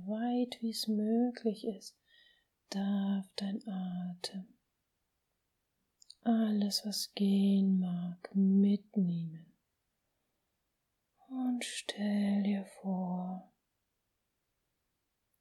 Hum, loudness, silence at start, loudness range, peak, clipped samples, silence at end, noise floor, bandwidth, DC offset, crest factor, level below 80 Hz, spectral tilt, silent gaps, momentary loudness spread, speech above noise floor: none; -34 LUFS; 0 s; 8 LU; -20 dBFS; under 0.1%; 2 s; -84 dBFS; 15.5 kHz; under 0.1%; 16 dB; -86 dBFS; -6 dB/octave; none; 13 LU; 50 dB